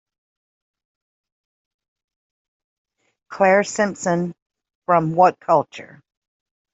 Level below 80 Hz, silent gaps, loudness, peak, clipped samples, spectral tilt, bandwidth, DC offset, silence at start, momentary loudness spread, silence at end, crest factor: -68 dBFS; 4.42-4.46 s, 4.75-4.82 s; -19 LUFS; -2 dBFS; under 0.1%; -5.5 dB/octave; 8.2 kHz; under 0.1%; 3.3 s; 18 LU; 0.9 s; 20 dB